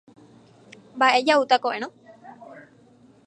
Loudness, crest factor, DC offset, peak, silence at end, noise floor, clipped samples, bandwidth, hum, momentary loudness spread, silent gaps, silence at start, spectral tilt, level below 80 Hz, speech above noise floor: -20 LUFS; 22 dB; under 0.1%; -4 dBFS; 0.65 s; -54 dBFS; under 0.1%; 10.5 kHz; none; 23 LU; none; 0.95 s; -2.5 dB/octave; -78 dBFS; 34 dB